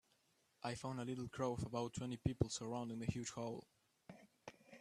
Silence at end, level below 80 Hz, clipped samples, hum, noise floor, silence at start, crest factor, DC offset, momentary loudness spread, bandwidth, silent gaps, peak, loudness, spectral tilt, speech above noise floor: 0 s; -64 dBFS; under 0.1%; none; -79 dBFS; 0.65 s; 26 dB; under 0.1%; 18 LU; 13.5 kHz; none; -20 dBFS; -45 LUFS; -5.5 dB/octave; 35 dB